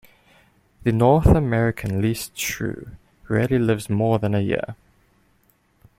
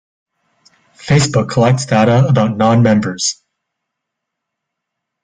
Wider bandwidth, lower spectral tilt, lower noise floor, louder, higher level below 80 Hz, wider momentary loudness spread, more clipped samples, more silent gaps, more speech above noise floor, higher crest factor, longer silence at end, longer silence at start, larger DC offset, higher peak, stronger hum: first, 16.5 kHz vs 9.4 kHz; about the same, -6.5 dB/octave vs -5.5 dB/octave; second, -62 dBFS vs -78 dBFS; second, -21 LUFS vs -13 LUFS; first, -36 dBFS vs -48 dBFS; first, 11 LU vs 7 LU; neither; neither; second, 42 dB vs 66 dB; first, 20 dB vs 14 dB; second, 1.25 s vs 1.9 s; second, 0.85 s vs 1 s; neither; about the same, -2 dBFS vs 0 dBFS; neither